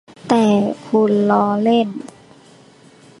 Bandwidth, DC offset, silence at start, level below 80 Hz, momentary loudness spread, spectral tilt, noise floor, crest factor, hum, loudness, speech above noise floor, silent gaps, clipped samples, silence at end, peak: 11 kHz; under 0.1%; 0.25 s; -64 dBFS; 10 LU; -7 dB/octave; -46 dBFS; 16 dB; none; -16 LUFS; 31 dB; none; under 0.1%; 1.15 s; -2 dBFS